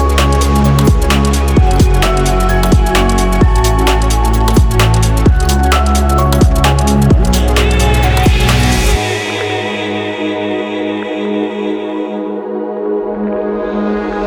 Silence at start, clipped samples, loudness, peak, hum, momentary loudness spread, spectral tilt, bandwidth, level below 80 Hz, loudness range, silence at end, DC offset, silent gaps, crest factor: 0 s; under 0.1%; -12 LUFS; 0 dBFS; none; 7 LU; -5.5 dB/octave; 20 kHz; -14 dBFS; 7 LU; 0 s; under 0.1%; none; 10 dB